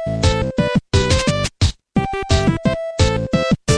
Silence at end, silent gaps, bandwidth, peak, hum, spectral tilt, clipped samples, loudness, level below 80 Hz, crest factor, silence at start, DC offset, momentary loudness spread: 0 s; none; 11 kHz; -2 dBFS; none; -5.5 dB/octave; under 0.1%; -18 LUFS; -28 dBFS; 16 dB; 0 s; under 0.1%; 4 LU